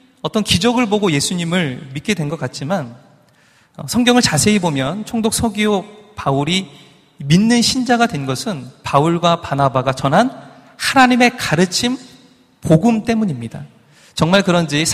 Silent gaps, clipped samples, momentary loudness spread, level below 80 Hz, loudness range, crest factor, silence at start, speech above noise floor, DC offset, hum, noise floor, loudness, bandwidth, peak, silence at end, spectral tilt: none; under 0.1%; 13 LU; -46 dBFS; 3 LU; 16 dB; 0.25 s; 37 dB; under 0.1%; none; -53 dBFS; -16 LUFS; 15.5 kHz; 0 dBFS; 0 s; -4.5 dB/octave